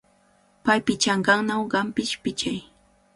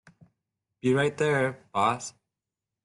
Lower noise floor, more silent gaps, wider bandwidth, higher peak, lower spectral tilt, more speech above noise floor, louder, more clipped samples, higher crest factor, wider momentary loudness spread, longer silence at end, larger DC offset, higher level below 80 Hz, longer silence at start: second, -61 dBFS vs -88 dBFS; neither; about the same, 11.5 kHz vs 11.5 kHz; first, -4 dBFS vs -10 dBFS; second, -3.5 dB/octave vs -5.5 dB/octave; second, 37 dB vs 62 dB; first, -23 LUFS vs -27 LUFS; neither; about the same, 20 dB vs 18 dB; about the same, 9 LU vs 8 LU; second, 0.55 s vs 0.75 s; neither; first, -58 dBFS vs -68 dBFS; second, 0.65 s vs 0.85 s